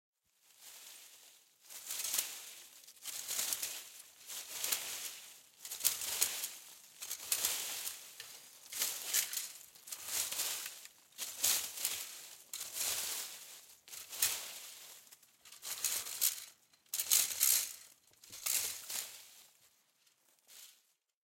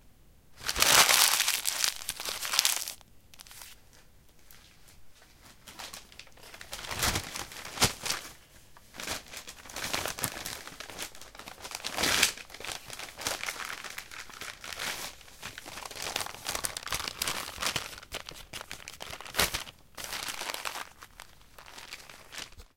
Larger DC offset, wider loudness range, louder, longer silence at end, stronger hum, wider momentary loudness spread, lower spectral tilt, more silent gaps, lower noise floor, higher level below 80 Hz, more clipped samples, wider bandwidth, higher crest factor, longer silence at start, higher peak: neither; second, 6 LU vs 11 LU; second, -36 LUFS vs -30 LUFS; first, 0.55 s vs 0.1 s; neither; about the same, 21 LU vs 20 LU; second, 2.5 dB/octave vs -0.5 dB/octave; neither; first, -74 dBFS vs -58 dBFS; second, -84 dBFS vs -54 dBFS; neither; about the same, 17 kHz vs 17 kHz; about the same, 32 dB vs 34 dB; first, 0.6 s vs 0.05 s; second, -10 dBFS vs 0 dBFS